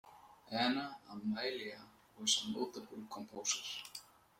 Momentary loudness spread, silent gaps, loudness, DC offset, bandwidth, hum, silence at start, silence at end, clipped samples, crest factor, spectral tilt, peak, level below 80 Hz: 15 LU; none; -39 LUFS; under 0.1%; 16.5 kHz; none; 0.05 s; 0.3 s; under 0.1%; 22 dB; -2 dB/octave; -18 dBFS; -80 dBFS